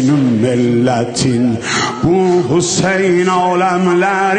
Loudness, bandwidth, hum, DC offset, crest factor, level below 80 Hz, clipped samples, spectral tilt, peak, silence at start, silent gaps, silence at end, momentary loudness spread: -13 LUFS; 9.6 kHz; none; under 0.1%; 10 dB; -44 dBFS; under 0.1%; -5 dB/octave; -2 dBFS; 0 s; none; 0 s; 3 LU